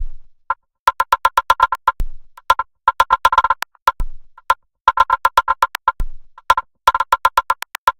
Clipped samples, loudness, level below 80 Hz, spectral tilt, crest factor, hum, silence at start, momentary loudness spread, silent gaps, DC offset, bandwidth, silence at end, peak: under 0.1%; -17 LUFS; -32 dBFS; -1.5 dB/octave; 18 dB; none; 0 s; 12 LU; 0.79-0.86 s, 3.82-3.86 s, 4.81-4.85 s, 7.78-7.87 s; under 0.1%; 17 kHz; 0.1 s; 0 dBFS